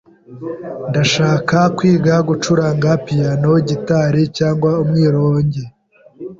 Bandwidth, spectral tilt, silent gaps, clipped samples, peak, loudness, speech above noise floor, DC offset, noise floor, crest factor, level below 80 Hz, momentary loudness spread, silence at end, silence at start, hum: 7.6 kHz; -6.5 dB/octave; none; under 0.1%; -2 dBFS; -15 LUFS; 26 dB; under 0.1%; -40 dBFS; 14 dB; -48 dBFS; 13 LU; 0.05 s; 0.3 s; none